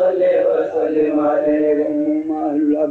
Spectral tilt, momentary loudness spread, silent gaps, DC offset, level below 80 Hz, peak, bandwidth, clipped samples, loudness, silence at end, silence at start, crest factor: -8.5 dB/octave; 4 LU; none; under 0.1%; -60 dBFS; -8 dBFS; 4.2 kHz; under 0.1%; -17 LUFS; 0 s; 0 s; 8 dB